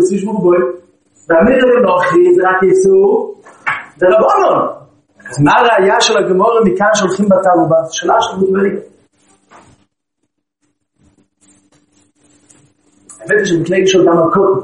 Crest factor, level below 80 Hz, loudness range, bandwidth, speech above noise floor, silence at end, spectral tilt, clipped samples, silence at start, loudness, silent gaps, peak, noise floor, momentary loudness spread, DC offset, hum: 12 dB; -50 dBFS; 8 LU; 10.5 kHz; 60 dB; 0 s; -5 dB/octave; under 0.1%; 0 s; -11 LUFS; none; 0 dBFS; -70 dBFS; 10 LU; under 0.1%; none